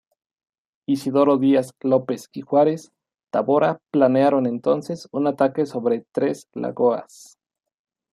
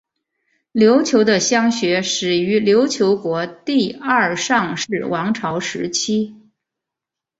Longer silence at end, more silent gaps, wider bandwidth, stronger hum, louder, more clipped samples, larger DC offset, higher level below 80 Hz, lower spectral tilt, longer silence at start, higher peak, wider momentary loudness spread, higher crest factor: about the same, 1.1 s vs 1.05 s; neither; first, 13 kHz vs 8 kHz; neither; second, -21 LUFS vs -17 LUFS; neither; neither; second, -72 dBFS vs -60 dBFS; first, -7 dB/octave vs -4 dB/octave; first, 0.9 s vs 0.75 s; about the same, -4 dBFS vs -2 dBFS; first, 12 LU vs 8 LU; about the same, 18 dB vs 16 dB